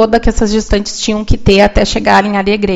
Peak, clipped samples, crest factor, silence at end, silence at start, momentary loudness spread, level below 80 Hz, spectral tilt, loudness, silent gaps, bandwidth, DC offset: 0 dBFS; 0.7%; 10 dB; 0 s; 0 s; 7 LU; -20 dBFS; -5 dB/octave; -11 LUFS; none; 8 kHz; under 0.1%